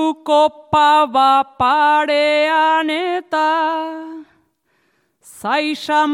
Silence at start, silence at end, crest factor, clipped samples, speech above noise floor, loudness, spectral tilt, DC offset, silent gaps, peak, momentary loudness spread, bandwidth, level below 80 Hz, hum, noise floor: 0 s; 0 s; 14 dB; under 0.1%; 48 dB; -15 LUFS; -4 dB/octave; under 0.1%; none; -4 dBFS; 9 LU; 14 kHz; -58 dBFS; none; -64 dBFS